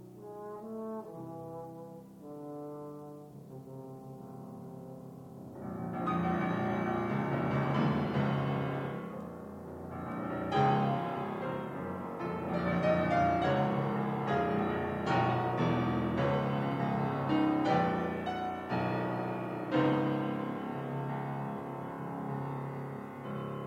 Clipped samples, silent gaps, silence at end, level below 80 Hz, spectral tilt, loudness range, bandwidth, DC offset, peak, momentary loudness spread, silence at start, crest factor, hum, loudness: under 0.1%; none; 0 s; -66 dBFS; -8 dB/octave; 14 LU; 15.5 kHz; under 0.1%; -16 dBFS; 18 LU; 0 s; 18 dB; none; -33 LUFS